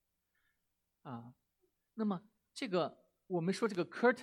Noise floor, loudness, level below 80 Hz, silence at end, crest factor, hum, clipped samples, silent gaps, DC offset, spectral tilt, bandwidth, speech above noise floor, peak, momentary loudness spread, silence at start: -85 dBFS; -37 LUFS; -88 dBFS; 0 s; 22 dB; none; under 0.1%; none; under 0.1%; -6 dB/octave; 12 kHz; 49 dB; -18 dBFS; 18 LU; 1.05 s